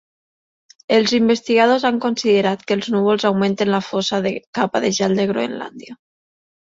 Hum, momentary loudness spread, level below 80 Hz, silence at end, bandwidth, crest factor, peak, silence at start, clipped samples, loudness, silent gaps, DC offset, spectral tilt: none; 8 LU; -60 dBFS; 0.75 s; 7.8 kHz; 16 dB; -2 dBFS; 0.9 s; under 0.1%; -18 LUFS; 4.47-4.53 s; under 0.1%; -5 dB/octave